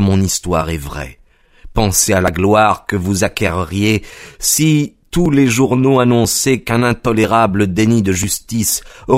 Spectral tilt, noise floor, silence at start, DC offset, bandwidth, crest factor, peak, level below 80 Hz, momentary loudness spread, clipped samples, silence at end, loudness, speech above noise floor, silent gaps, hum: -4.5 dB/octave; -38 dBFS; 0 s; under 0.1%; 16 kHz; 14 dB; 0 dBFS; -34 dBFS; 8 LU; under 0.1%; 0 s; -14 LUFS; 25 dB; none; none